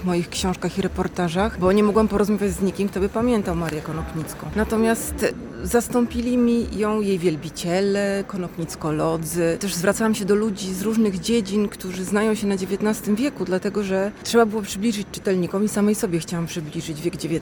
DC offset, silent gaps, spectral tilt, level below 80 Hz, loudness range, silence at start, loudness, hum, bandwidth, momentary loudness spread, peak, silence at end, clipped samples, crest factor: under 0.1%; none; -5.5 dB/octave; -42 dBFS; 2 LU; 0 s; -22 LUFS; none; 18 kHz; 8 LU; -6 dBFS; 0 s; under 0.1%; 16 dB